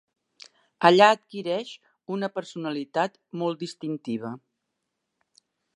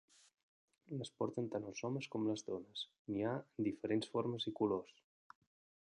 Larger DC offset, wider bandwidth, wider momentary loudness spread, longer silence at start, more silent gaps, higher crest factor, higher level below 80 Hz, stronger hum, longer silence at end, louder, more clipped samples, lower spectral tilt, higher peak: neither; about the same, 11 kHz vs 10.5 kHz; first, 18 LU vs 9 LU; about the same, 0.8 s vs 0.9 s; second, none vs 2.99-3.05 s; about the same, 24 dB vs 20 dB; about the same, -82 dBFS vs -78 dBFS; neither; first, 1.4 s vs 1.05 s; first, -25 LUFS vs -42 LUFS; neither; about the same, -5 dB/octave vs -6 dB/octave; first, -2 dBFS vs -22 dBFS